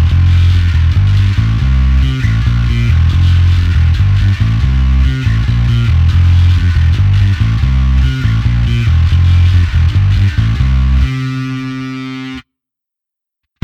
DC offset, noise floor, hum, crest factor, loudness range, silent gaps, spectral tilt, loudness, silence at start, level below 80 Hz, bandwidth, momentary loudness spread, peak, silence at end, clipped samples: under 0.1%; -82 dBFS; none; 10 dB; 3 LU; none; -7 dB/octave; -12 LUFS; 0 s; -14 dBFS; 6.8 kHz; 7 LU; 0 dBFS; 1.2 s; under 0.1%